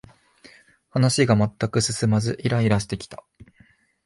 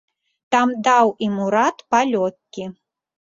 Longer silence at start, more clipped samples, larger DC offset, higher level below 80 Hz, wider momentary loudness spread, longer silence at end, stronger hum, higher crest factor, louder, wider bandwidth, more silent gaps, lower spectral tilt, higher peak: first, 0.95 s vs 0.5 s; neither; neither; first, -50 dBFS vs -66 dBFS; second, 13 LU vs 17 LU; first, 0.9 s vs 0.6 s; neither; about the same, 18 dB vs 18 dB; second, -22 LUFS vs -18 LUFS; first, 11.5 kHz vs 7.8 kHz; neither; about the same, -5.5 dB/octave vs -4.5 dB/octave; second, -6 dBFS vs -2 dBFS